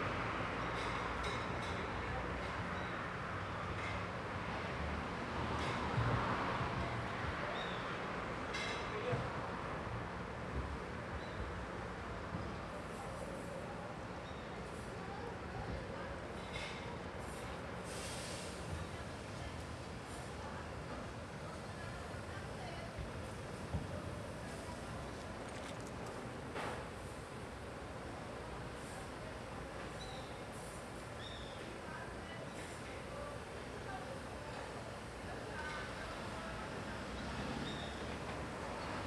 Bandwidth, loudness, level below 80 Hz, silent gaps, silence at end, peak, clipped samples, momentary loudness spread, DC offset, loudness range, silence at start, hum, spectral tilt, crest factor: 13.5 kHz; -44 LUFS; -54 dBFS; none; 0 s; -26 dBFS; under 0.1%; 7 LU; under 0.1%; 8 LU; 0 s; none; -5 dB/octave; 18 dB